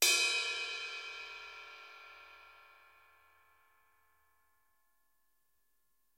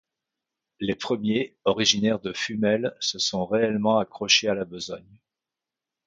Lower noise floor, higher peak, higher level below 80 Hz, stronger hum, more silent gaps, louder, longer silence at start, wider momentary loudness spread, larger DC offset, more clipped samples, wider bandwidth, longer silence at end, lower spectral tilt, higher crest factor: second, -81 dBFS vs -89 dBFS; second, -14 dBFS vs -4 dBFS; second, -84 dBFS vs -62 dBFS; neither; neither; second, -34 LUFS vs -24 LUFS; second, 0 s vs 0.8 s; first, 26 LU vs 12 LU; neither; neither; first, 16 kHz vs 7.8 kHz; first, 3.65 s vs 1.05 s; second, 3 dB/octave vs -3.5 dB/octave; about the same, 26 dB vs 22 dB